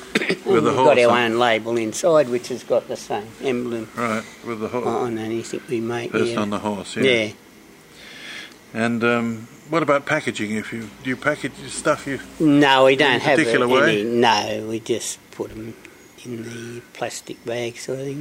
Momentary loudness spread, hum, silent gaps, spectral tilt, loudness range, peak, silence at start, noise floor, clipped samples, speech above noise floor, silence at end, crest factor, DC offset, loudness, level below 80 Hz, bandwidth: 17 LU; none; none; -4.5 dB/octave; 8 LU; -2 dBFS; 0 s; -46 dBFS; under 0.1%; 26 dB; 0 s; 20 dB; under 0.1%; -20 LUFS; -58 dBFS; 16 kHz